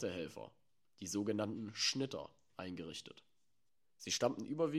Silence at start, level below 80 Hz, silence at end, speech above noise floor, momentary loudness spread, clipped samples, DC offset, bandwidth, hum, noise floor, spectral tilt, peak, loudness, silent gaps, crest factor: 0 s; -78 dBFS; 0 s; 48 dB; 16 LU; under 0.1%; under 0.1%; 14.5 kHz; none; -88 dBFS; -3.5 dB/octave; -20 dBFS; -40 LUFS; none; 22 dB